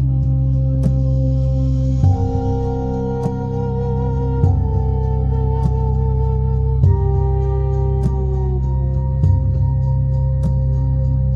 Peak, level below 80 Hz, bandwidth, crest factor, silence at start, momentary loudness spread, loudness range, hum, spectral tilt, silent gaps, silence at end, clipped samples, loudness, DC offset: -2 dBFS; -20 dBFS; 3.2 kHz; 14 dB; 0 s; 4 LU; 1 LU; none; -11 dB/octave; none; 0 s; under 0.1%; -18 LUFS; under 0.1%